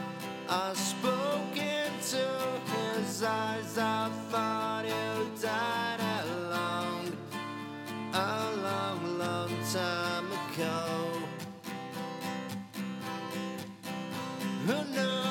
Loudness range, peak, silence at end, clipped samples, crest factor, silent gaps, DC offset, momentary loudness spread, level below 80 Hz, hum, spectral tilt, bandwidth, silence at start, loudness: 5 LU; -14 dBFS; 0 s; under 0.1%; 20 dB; none; under 0.1%; 8 LU; -82 dBFS; none; -4 dB/octave; 19 kHz; 0 s; -34 LUFS